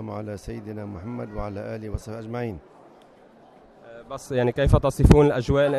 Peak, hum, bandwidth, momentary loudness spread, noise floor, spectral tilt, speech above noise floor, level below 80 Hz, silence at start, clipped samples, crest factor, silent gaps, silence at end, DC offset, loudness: 0 dBFS; none; 13.5 kHz; 18 LU; -52 dBFS; -7.5 dB/octave; 29 dB; -32 dBFS; 0 s; under 0.1%; 22 dB; none; 0 s; under 0.1%; -23 LUFS